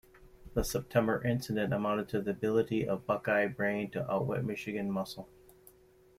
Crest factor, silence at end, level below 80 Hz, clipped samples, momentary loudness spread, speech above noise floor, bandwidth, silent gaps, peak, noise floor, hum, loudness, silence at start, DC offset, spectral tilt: 20 dB; 0.9 s; -52 dBFS; under 0.1%; 6 LU; 30 dB; 16 kHz; none; -14 dBFS; -62 dBFS; none; -33 LUFS; 0.2 s; under 0.1%; -6 dB/octave